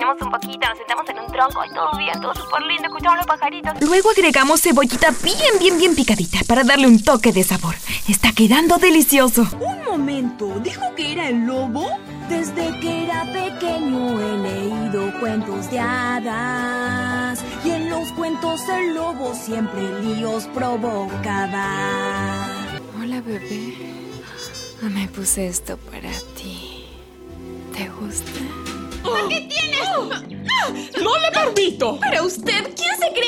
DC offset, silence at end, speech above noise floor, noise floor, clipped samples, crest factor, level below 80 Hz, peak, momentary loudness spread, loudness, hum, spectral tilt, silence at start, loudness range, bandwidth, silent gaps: under 0.1%; 0 s; 20 dB; -39 dBFS; under 0.1%; 18 dB; -42 dBFS; -2 dBFS; 16 LU; -19 LUFS; none; -3.5 dB/octave; 0 s; 12 LU; 16.5 kHz; none